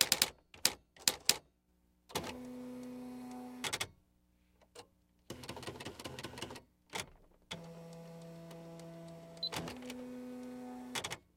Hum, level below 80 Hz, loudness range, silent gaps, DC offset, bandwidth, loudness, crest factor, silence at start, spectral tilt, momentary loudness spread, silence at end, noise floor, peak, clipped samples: none; -68 dBFS; 11 LU; none; under 0.1%; 16.5 kHz; -39 LUFS; 36 dB; 0 s; -1.5 dB/octave; 19 LU; 0.15 s; -74 dBFS; -8 dBFS; under 0.1%